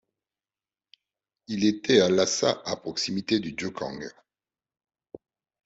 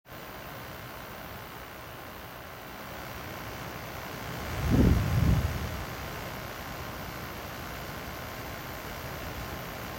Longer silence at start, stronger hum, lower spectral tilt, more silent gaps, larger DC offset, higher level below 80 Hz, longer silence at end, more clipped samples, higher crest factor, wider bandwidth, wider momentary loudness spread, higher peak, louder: first, 1.5 s vs 0.05 s; neither; second, -4 dB/octave vs -6 dB/octave; neither; neither; second, -66 dBFS vs -40 dBFS; first, 1.55 s vs 0 s; neither; about the same, 22 dB vs 22 dB; second, 8 kHz vs 16.5 kHz; about the same, 15 LU vs 16 LU; first, -6 dBFS vs -12 dBFS; first, -25 LUFS vs -34 LUFS